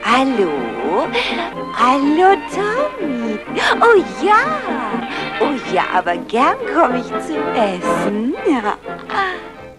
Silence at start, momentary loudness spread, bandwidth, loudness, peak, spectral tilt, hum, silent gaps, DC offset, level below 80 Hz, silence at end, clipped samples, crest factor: 0 s; 9 LU; 12.5 kHz; -17 LUFS; 0 dBFS; -4.5 dB/octave; none; none; under 0.1%; -48 dBFS; 0.05 s; under 0.1%; 16 dB